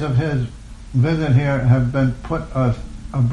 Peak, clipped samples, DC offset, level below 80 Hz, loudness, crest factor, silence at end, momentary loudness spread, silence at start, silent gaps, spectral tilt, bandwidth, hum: -4 dBFS; under 0.1%; under 0.1%; -34 dBFS; -19 LUFS; 14 dB; 0 s; 11 LU; 0 s; none; -8.5 dB/octave; 9.2 kHz; none